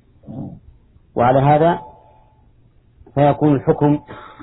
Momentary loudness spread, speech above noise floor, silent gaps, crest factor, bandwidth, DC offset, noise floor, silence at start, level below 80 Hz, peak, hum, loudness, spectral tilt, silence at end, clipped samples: 20 LU; 37 dB; none; 16 dB; 4 kHz; under 0.1%; -52 dBFS; 0.3 s; -46 dBFS; -2 dBFS; none; -16 LUFS; -12.5 dB/octave; 0 s; under 0.1%